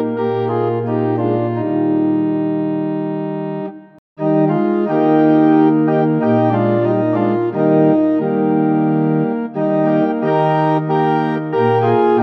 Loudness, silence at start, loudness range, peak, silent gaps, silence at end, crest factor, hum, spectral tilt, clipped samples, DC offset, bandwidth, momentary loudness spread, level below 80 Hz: -16 LUFS; 0 s; 4 LU; -2 dBFS; 3.98-4.16 s; 0 s; 14 dB; none; -10.5 dB/octave; under 0.1%; under 0.1%; 4.9 kHz; 7 LU; -74 dBFS